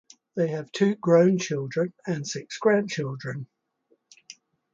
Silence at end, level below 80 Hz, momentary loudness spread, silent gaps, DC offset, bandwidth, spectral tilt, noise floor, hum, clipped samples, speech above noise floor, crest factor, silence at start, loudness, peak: 0.4 s; -72 dBFS; 16 LU; none; under 0.1%; 7.8 kHz; -6 dB/octave; -69 dBFS; none; under 0.1%; 44 dB; 18 dB; 0.35 s; -25 LUFS; -8 dBFS